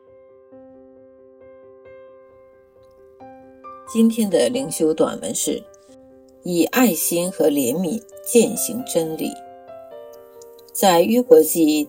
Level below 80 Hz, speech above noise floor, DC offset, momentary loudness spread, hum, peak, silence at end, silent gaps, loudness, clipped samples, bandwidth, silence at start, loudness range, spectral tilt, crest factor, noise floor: -62 dBFS; 32 dB; under 0.1%; 24 LU; none; 0 dBFS; 0 s; none; -19 LUFS; under 0.1%; 17 kHz; 0.55 s; 4 LU; -4 dB/octave; 22 dB; -50 dBFS